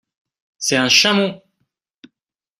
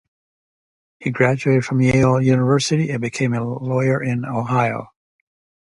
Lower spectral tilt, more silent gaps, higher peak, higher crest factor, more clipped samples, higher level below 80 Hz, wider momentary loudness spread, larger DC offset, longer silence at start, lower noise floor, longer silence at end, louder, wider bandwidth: second, -2.5 dB/octave vs -6.5 dB/octave; neither; about the same, 0 dBFS vs -2 dBFS; about the same, 20 dB vs 18 dB; neither; second, -62 dBFS vs -50 dBFS; first, 12 LU vs 8 LU; neither; second, 0.6 s vs 1 s; second, -82 dBFS vs under -90 dBFS; first, 1.25 s vs 0.9 s; first, -15 LUFS vs -19 LUFS; first, 15.5 kHz vs 11.5 kHz